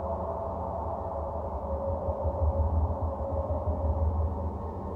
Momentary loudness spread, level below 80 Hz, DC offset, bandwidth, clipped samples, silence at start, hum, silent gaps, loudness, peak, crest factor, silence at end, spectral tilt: 6 LU; -36 dBFS; under 0.1%; 2.2 kHz; under 0.1%; 0 s; none; none; -32 LUFS; -16 dBFS; 14 dB; 0 s; -11.5 dB/octave